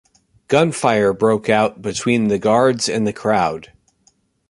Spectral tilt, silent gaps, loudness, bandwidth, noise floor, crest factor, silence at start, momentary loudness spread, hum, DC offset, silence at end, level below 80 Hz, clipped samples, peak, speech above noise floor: -5 dB/octave; none; -17 LUFS; 11.5 kHz; -60 dBFS; 16 dB; 0.5 s; 5 LU; none; under 0.1%; 0.85 s; -52 dBFS; under 0.1%; -2 dBFS; 43 dB